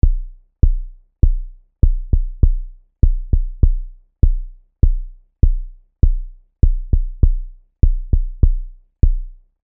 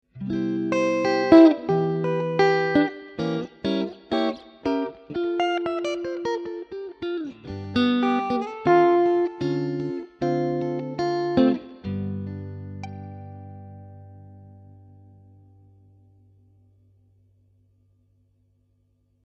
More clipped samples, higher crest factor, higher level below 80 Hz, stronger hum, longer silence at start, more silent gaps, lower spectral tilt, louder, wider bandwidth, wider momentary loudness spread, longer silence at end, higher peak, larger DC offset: neither; second, 16 dB vs 22 dB; first, -16 dBFS vs -60 dBFS; second, none vs 50 Hz at -65 dBFS; about the same, 0.05 s vs 0.15 s; neither; first, -16.5 dB/octave vs -7 dB/octave; about the same, -21 LUFS vs -23 LUFS; second, 1 kHz vs 7.4 kHz; first, 22 LU vs 18 LU; second, 0.35 s vs 4.65 s; about the same, 0 dBFS vs -2 dBFS; first, 0.5% vs under 0.1%